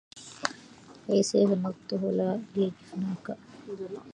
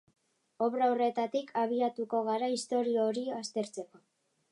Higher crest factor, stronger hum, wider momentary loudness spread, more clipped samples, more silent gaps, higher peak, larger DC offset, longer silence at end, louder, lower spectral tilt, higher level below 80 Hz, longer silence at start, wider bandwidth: first, 24 dB vs 14 dB; neither; first, 18 LU vs 8 LU; neither; neither; first, -6 dBFS vs -18 dBFS; neither; second, 0 s vs 0.55 s; about the same, -30 LUFS vs -32 LUFS; about the same, -5.5 dB/octave vs -4.5 dB/octave; first, -72 dBFS vs -88 dBFS; second, 0.15 s vs 0.6 s; about the same, 11.5 kHz vs 11.5 kHz